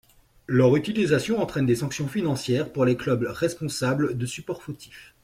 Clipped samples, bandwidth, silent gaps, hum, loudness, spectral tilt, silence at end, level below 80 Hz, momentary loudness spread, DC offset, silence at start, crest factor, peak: under 0.1%; 15.5 kHz; none; none; -25 LUFS; -6 dB/octave; 0.2 s; -56 dBFS; 13 LU; under 0.1%; 0.5 s; 16 dB; -8 dBFS